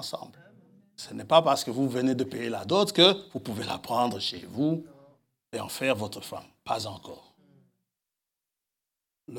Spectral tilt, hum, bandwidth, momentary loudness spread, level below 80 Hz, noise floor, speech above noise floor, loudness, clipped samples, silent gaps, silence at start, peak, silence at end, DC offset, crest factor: -4.5 dB/octave; none; 18 kHz; 20 LU; -74 dBFS; -88 dBFS; 60 dB; -27 LUFS; under 0.1%; none; 0 s; -4 dBFS; 0 s; under 0.1%; 24 dB